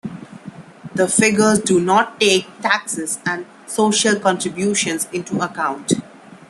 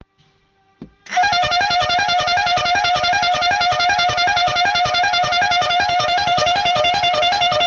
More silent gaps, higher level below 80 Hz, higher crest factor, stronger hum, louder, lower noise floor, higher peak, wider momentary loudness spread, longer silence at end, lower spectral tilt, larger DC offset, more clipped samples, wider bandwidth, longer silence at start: neither; second, -60 dBFS vs -46 dBFS; first, 18 dB vs 12 dB; neither; about the same, -18 LUFS vs -16 LUFS; second, -37 dBFS vs -59 dBFS; first, 0 dBFS vs -4 dBFS; first, 14 LU vs 1 LU; first, 0.15 s vs 0 s; first, -3 dB/octave vs -1.5 dB/octave; neither; neither; first, 12.5 kHz vs 7.6 kHz; second, 0.05 s vs 0.8 s